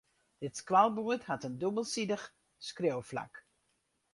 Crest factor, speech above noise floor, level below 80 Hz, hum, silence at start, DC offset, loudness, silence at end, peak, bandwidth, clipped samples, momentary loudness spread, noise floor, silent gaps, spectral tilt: 22 dB; 45 dB; -74 dBFS; none; 0.4 s; under 0.1%; -34 LUFS; 0.75 s; -14 dBFS; 11.5 kHz; under 0.1%; 18 LU; -78 dBFS; none; -4.5 dB/octave